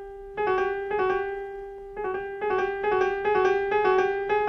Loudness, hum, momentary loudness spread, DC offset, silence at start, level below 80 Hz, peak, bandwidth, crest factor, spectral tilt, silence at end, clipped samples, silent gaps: -26 LUFS; none; 12 LU; under 0.1%; 0 s; -52 dBFS; -10 dBFS; 6.2 kHz; 16 dB; -5.5 dB/octave; 0 s; under 0.1%; none